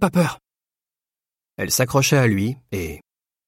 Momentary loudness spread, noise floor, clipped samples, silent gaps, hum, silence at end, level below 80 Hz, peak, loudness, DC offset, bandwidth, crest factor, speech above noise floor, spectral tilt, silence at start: 16 LU; under -90 dBFS; under 0.1%; none; none; 0.5 s; -48 dBFS; -4 dBFS; -20 LUFS; under 0.1%; 16.5 kHz; 18 dB; over 70 dB; -4.5 dB/octave; 0 s